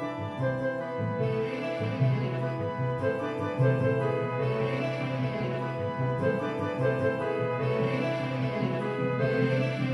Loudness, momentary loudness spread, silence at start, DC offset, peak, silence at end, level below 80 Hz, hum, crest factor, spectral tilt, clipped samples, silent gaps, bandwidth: -29 LUFS; 5 LU; 0 s; under 0.1%; -12 dBFS; 0 s; -62 dBFS; none; 16 dB; -8.5 dB/octave; under 0.1%; none; 6.4 kHz